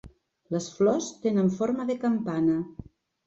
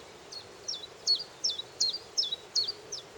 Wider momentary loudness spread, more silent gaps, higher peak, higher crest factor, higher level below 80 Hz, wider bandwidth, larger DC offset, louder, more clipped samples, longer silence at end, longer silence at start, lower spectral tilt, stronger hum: second, 8 LU vs 13 LU; neither; about the same, -12 dBFS vs -14 dBFS; second, 14 dB vs 20 dB; first, -60 dBFS vs -74 dBFS; second, 8 kHz vs 18 kHz; neither; first, -27 LUFS vs -31 LUFS; neither; first, 0.45 s vs 0 s; about the same, 0.05 s vs 0 s; first, -6.5 dB/octave vs 0.5 dB/octave; neither